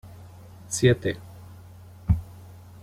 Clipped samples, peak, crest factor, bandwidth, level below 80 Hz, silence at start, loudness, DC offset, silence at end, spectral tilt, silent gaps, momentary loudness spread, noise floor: under 0.1%; -6 dBFS; 22 dB; 16 kHz; -40 dBFS; 0.05 s; -25 LUFS; under 0.1%; 0.4 s; -5.5 dB/octave; none; 25 LU; -46 dBFS